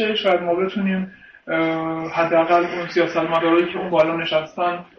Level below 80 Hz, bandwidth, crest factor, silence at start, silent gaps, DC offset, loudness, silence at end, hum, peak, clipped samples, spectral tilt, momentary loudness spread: -60 dBFS; 6.6 kHz; 14 dB; 0 s; none; under 0.1%; -20 LUFS; 0.15 s; none; -6 dBFS; under 0.1%; -6.5 dB/octave; 7 LU